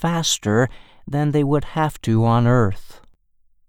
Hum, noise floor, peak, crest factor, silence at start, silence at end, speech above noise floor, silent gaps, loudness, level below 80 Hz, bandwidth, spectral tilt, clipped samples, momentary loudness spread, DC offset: none; -58 dBFS; -4 dBFS; 16 dB; 0 s; 0.7 s; 39 dB; none; -19 LUFS; -42 dBFS; 16 kHz; -5.5 dB/octave; under 0.1%; 8 LU; under 0.1%